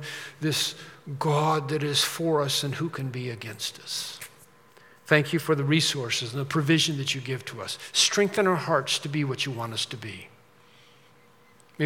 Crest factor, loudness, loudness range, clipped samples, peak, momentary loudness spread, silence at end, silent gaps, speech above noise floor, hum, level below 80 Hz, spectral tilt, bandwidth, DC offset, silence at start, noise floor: 26 dB; -26 LUFS; 4 LU; under 0.1%; -2 dBFS; 13 LU; 0 s; none; 31 dB; none; -74 dBFS; -4 dB/octave; 17.5 kHz; under 0.1%; 0 s; -58 dBFS